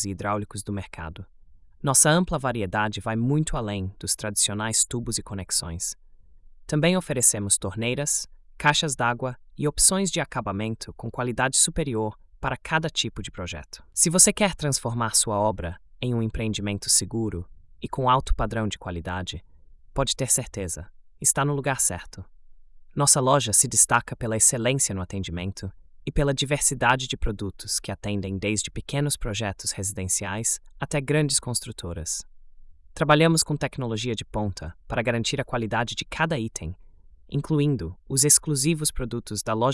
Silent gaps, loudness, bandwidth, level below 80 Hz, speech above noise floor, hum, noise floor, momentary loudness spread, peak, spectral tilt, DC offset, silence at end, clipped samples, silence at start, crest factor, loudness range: none; -24 LUFS; 12 kHz; -42 dBFS; 24 dB; none; -49 dBFS; 14 LU; -4 dBFS; -3 dB/octave; under 0.1%; 0 s; under 0.1%; 0 s; 22 dB; 6 LU